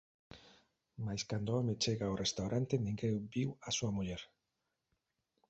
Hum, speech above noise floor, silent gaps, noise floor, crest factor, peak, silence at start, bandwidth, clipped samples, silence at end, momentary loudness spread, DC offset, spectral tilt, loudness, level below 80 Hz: none; 50 dB; none; -87 dBFS; 20 dB; -20 dBFS; 0.35 s; 8.2 kHz; under 0.1%; 1.25 s; 11 LU; under 0.1%; -5 dB/octave; -38 LUFS; -62 dBFS